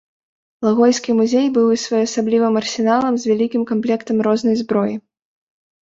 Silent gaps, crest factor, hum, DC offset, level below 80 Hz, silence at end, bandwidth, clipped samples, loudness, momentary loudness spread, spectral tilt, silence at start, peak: none; 16 dB; none; under 0.1%; -62 dBFS; 0.85 s; 8 kHz; under 0.1%; -17 LUFS; 5 LU; -5 dB/octave; 0.6 s; -2 dBFS